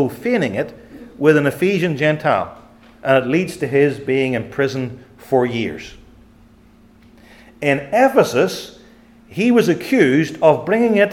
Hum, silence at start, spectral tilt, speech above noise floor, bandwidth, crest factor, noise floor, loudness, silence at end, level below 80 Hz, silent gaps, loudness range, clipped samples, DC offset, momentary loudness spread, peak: none; 0 s; -6 dB/octave; 32 dB; 17 kHz; 18 dB; -48 dBFS; -17 LUFS; 0 s; -54 dBFS; none; 7 LU; under 0.1%; under 0.1%; 12 LU; 0 dBFS